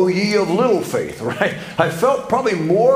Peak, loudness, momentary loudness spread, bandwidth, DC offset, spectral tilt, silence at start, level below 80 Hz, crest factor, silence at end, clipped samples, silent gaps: 0 dBFS; -18 LUFS; 6 LU; 16 kHz; under 0.1%; -5.5 dB/octave; 0 s; -54 dBFS; 16 dB; 0 s; under 0.1%; none